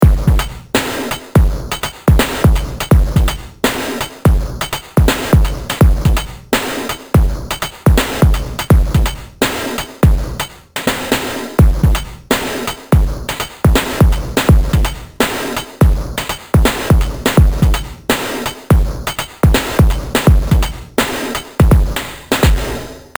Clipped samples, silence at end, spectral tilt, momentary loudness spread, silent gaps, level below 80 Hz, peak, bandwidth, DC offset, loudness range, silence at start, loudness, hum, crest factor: under 0.1%; 0.15 s; -5.5 dB/octave; 9 LU; none; -16 dBFS; 0 dBFS; over 20 kHz; 0.4%; 2 LU; 0 s; -15 LUFS; none; 14 dB